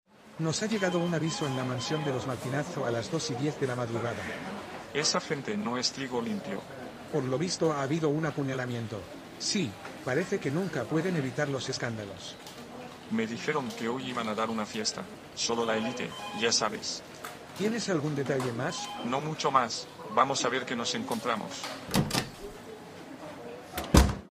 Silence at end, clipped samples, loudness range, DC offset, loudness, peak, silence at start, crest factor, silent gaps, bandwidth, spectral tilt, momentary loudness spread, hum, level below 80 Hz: 0.05 s; under 0.1%; 3 LU; under 0.1%; -31 LUFS; -4 dBFS; 0.2 s; 28 dB; none; 15.5 kHz; -4.5 dB/octave; 14 LU; none; -44 dBFS